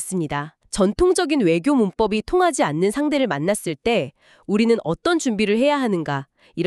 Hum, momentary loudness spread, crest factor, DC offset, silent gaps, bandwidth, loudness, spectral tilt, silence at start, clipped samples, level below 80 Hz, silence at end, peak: none; 8 LU; 14 dB; under 0.1%; none; 13.5 kHz; -20 LUFS; -5 dB/octave; 0 s; under 0.1%; -46 dBFS; 0 s; -6 dBFS